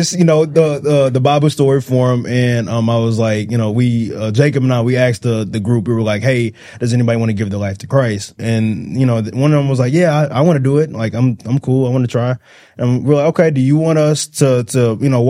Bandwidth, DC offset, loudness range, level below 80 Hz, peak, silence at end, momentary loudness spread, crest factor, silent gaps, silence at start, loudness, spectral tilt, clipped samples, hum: 14.5 kHz; under 0.1%; 2 LU; -52 dBFS; 0 dBFS; 0 s; 6 LU; 14 dB; none; 0 s; -14 LUFS; -6.5 dB/octave; under 0.1%; none